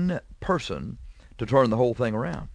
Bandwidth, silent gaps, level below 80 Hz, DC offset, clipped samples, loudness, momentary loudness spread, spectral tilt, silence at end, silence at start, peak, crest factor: 10.5 kHz; none; -46 dBFS; under 0.1%; under 0.1%; -25 LUFS; 15 LU; -7 dB/octave; 0 s; 0 s; -8 dBFS; 18 dB